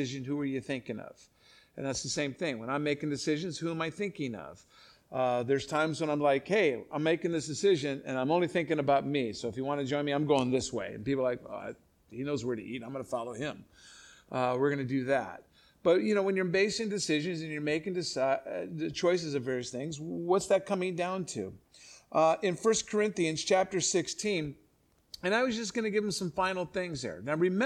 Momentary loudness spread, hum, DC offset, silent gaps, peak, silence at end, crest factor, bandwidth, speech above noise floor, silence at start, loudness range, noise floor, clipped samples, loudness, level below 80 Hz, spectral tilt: 11 LU; none; under 0.1%; none; -12 dBFS; 0 s; 18 dB; 13 kHz; 37 dB; 0 s; 5 LU; -68 dBFS; under 0.1%; -31 LUFS; -66 dBFS; -4.5 dB/octave